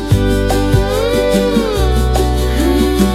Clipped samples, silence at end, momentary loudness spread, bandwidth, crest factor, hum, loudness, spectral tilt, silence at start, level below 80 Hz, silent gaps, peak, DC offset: under 0.1%; 0 s; 2 LU; 15.5 kHz; 12 dB; none; -14 LUFS; -6 dB/octave; 0 s; -18 dBFS; none; 0 dBFS; under 0.1%